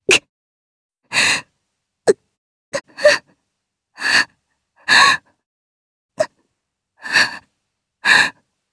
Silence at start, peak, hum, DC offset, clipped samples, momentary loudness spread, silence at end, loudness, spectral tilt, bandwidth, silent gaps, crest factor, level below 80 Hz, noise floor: 0.1 s; 0 dBFS; none; under 0.1%; under 0.1%; 17 LU; 0.4 s; -16 LUFS; -0.5 dB/octave; 11 kHz; 0.29-0.89 s, 2.38-2.72 s, 5.46-6.09 s; 20 dB; -60 dBFS; -77 dBFS